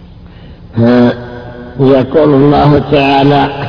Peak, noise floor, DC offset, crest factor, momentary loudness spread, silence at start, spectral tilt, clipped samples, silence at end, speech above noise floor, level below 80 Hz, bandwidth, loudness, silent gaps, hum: 0 dBFS; -32 dBFS; under 0.1%; 10 dB; 16 LU; 0 s; -9 dB/octave; 0.8%; 0 s; 25 dB; -32 dBFS; 5.4 kHz; -8 LUFS; none; none